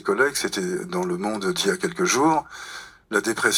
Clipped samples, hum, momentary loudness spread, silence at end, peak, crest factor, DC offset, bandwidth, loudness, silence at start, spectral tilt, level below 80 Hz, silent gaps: under 0.1%; none; 15 LU; 0 s; -4 dBFS; 20 dB; under 0.1%; 19 kHz; -23 LUFS; 0.05 s; -3 dB/octave; -60 dBFS; none